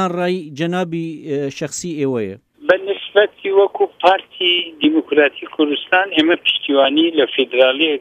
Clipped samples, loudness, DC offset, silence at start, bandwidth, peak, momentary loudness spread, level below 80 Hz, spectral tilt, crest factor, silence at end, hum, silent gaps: under 0.1%; -16 LUFS; under 0.1%; 0 s; 10 kHz; 0 dBFS; 9 LU; -64 dBFS; -4.5 dB/octave; 16 dB; 0 s; none; none